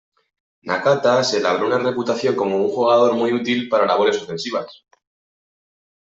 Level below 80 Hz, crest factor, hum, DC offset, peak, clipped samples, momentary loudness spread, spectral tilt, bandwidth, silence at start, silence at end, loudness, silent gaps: -66 dBFS; 16 dB; none; under 0.1%; -4 dBFS; under 0.1%; 9 LU; -4.5 dB/octave; 8 kHz; 0.65 s; 1.35 s; -19 LUFS; none